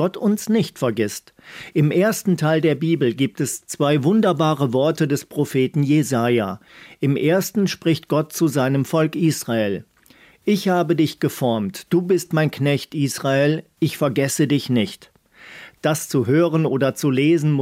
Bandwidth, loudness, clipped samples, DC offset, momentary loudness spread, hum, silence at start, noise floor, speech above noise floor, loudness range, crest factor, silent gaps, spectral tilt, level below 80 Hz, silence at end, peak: 16 kHz; -20 LUFS; under 0.1%; under 0.1%; 8 LU; none; 0 s; -52 dBFS; 32 dB; 2 LU; 14 dB; none; -6 dB/octave; -66 dBFS; 0 s; -4 dBFS